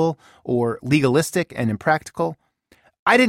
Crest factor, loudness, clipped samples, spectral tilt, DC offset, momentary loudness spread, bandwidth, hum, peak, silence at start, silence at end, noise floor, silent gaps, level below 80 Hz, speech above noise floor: 18 dB; -21 LUFS; under 0.1%; -5.5 dB/octave; under 0.1%; 9 LU; 16 kHz; none; -4 dBFS; 0 s; 0 s; -58 dBFS; 2.99-3.06 s; -56 dBFS; 37 dB